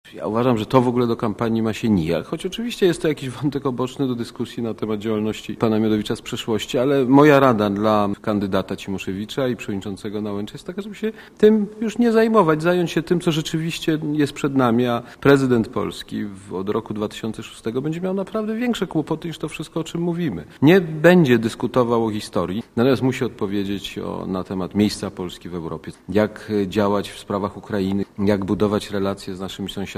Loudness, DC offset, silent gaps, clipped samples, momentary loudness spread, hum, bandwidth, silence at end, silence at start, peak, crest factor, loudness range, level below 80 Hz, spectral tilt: -21 LUFS; under 0.1%; none; under 0.1%; 13 LU; none; 15.5 kHz; 0.05 s; 0.05 s; 0 dBFS; 20 dB; 7 LU; -48 dBFS; -6.5 dB/octave